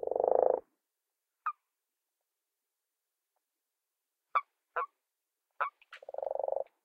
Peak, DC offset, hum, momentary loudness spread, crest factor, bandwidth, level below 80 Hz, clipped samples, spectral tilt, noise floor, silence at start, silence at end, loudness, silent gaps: -12 dBFS; under 0.1%; none; 14 LU; 26 dB; 4.9 kHz; -84 dBFS; under 0.1%; -5.5 dB/octave; -88 dBFS; 0 s; 0.2 s; -35 LUFS; none